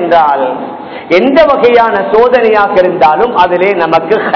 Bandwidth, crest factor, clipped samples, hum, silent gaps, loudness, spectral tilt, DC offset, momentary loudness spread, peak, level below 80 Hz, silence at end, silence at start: 5.4 kHz; 8 dB; 5%; none; none; -8 LUFS; -6.5 dB/octave; under 0.1%; 7 LU; 0 dBFS; -42 dBFS; 0 s; 0 s